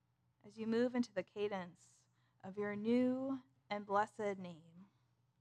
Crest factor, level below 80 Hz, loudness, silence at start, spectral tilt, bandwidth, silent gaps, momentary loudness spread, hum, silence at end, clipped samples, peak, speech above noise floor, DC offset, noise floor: 20 dB; -84 dBFS; -40 LUFS; 0.45 s; -6.5 dB/octave; 9.4 kHz; none; 18 LU; none; 0.55 s; under 0.1%; -22 dBFS; 38 dB; under 0.1%; -78 dBFS